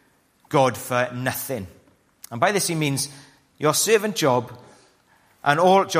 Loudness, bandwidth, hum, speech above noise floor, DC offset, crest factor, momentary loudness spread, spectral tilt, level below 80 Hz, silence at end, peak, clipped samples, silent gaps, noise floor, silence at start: -22 LUFS; 15.5 kHz; none; 39 dB; under 0.1%; 20 dB; 12 LU; -4 dB/octave; -64 dBFS; 0 s; -2 dBFS; under 0.1%; none; -60 dBFS; 0.5 s